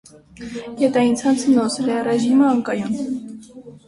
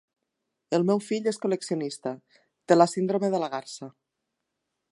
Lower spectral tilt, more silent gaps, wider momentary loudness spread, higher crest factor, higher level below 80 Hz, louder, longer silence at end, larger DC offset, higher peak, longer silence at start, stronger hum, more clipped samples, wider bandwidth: about the same, -5 dB/octave vs -5.5 dB/octave; neither; about the same, 17 LU vs 19 LU; second, 14 dB vs 24 dB; first, -58 dBFS vs -82 dBFS; first, -18 LUFS vs -26 LUFS; second, 0.1 s vs 1 s; neither; about the same, -4 dBFS vs -4 dBFS; second, 0.4 s vs 0.7 s; neither; neither; about the same, 11.5 kHz vs 11.5 kHz